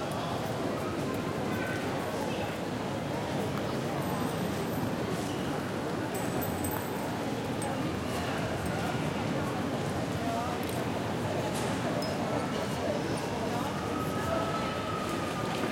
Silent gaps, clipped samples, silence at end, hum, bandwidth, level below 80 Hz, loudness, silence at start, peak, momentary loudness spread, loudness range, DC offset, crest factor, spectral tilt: none; under 0.1%; 0 s; none; 16.5 kHz; -56 dBFS; -32 LUFS; 0 s; -16 dBFS; 2 LU; 1 LU; under 0.1%; 16 dB; -5.5 dB/octave